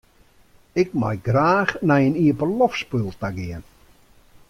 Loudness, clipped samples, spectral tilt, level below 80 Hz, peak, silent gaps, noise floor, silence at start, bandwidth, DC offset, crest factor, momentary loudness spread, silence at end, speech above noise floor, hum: -21 LUFS; under 0.1%; -7.5 dB/octave; -50 dBFS; -4 dBFS; none; -55 dBFS; 0.75 s; 14.5 kHz; under 0.1%; 18 dB; 11 LU; 0.85 s; 34 dB; none